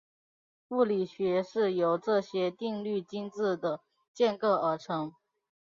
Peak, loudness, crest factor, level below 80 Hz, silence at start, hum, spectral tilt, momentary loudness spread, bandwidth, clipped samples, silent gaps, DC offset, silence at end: -14 dBFS; -30 LUFS; 18 dB; -78 dBFS; 0.7 s; none; -6.5 dB/octave; 8 LU; 7.4 kHz; under 0.1%; 4.08-4.14 s; under 0.1%; 0.55 s